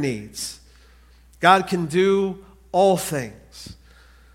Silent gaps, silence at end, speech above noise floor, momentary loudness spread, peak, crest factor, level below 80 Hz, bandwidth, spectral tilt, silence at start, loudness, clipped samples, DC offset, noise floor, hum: none; 0.6 s; 30 dB; 24 LU; 0 dBFS; 22 dB; -52 dBFS; 16.5 kHz; -4.5 dB/octave; 0 s; -21 LUFS; under 0.1%; under 0.1%; -51 dBFS; none